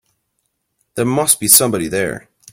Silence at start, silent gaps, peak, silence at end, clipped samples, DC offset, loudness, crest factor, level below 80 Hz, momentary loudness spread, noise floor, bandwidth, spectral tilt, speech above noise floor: 0.95 s; none; 0 dBFS; 0.35 s; 0.1%; under 0.1%; -13 LUFS; 18 dB; -52 dBFS; 18 LU; -70 dBFS; over 20 kHz; -2.5 dB/octave; 55 dB